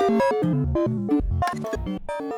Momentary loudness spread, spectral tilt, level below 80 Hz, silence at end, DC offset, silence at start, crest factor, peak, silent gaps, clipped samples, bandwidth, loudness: 9 LU; -7.5 dB/octave; -34 dBFS; 0 s; under 0.1%; 0 s; 12 dB; -10 dBFS; none; under 0.1%; 18 kHz; -24 LUFS